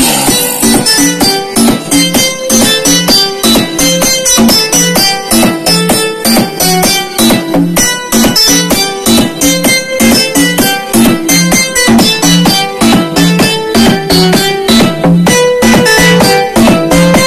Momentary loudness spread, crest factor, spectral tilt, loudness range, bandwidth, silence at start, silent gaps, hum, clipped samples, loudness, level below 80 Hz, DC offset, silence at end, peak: 4 LU; 8 dB; -3 dB/octave; 1 LU; 15.5 kHz; 0 s; none; none; 0.5%; -6 LUFS; -30 dBFS; 0.7%; 0 s; 0 dBFS